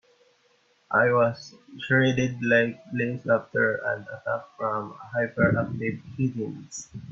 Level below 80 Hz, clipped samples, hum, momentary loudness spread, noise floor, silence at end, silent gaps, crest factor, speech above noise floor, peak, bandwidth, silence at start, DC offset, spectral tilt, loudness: -60 dBFS; under 0.1%; none; 13 LU; -65 dBFS; 0 s; none; 18 dB; 39 dB; -8 dBFS; 7.8 kHz; 0.9 s; under 0.1%; -6 dB/octave; -25 LUFS